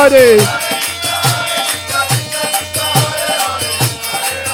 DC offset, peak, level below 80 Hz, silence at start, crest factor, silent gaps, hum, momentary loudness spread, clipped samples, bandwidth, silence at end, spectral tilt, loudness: under 0.1%; 0 dBFS; -48 dBFS; 0 s; 14 dB; none; none; 7 LU; under 0.1%; 17 kHz; 0 s; -3 dB/octave; -13 LUFS